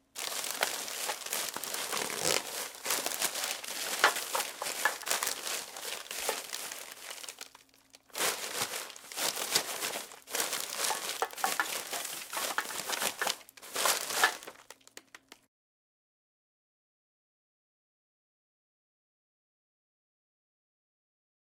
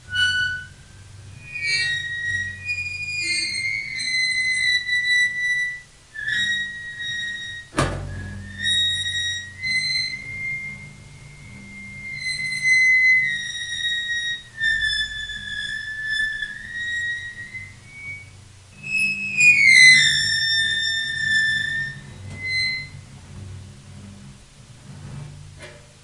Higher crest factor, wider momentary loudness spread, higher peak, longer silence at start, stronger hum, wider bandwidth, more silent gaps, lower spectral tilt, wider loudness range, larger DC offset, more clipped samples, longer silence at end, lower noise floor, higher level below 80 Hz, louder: first, 30 dB vs 22 dB; second, 13 LU vs 22 LU; second, -6 dBFS vs 0 dBFS; about the same, 0.15 s vs 0.05 s; neither; first, 18 kHz vs 11.5 kHz; neither; second, 1 dB/octave vs -0.5 dB/octave; second, 5 LU vs 12 LU; neither; neither; first, 6.1 s vs 0.2 s; first, -61 dBFS vs -45 dBFS; second, -80 dBFS vs -50 dBFS; second, -33 LUFS vs -19 LUFS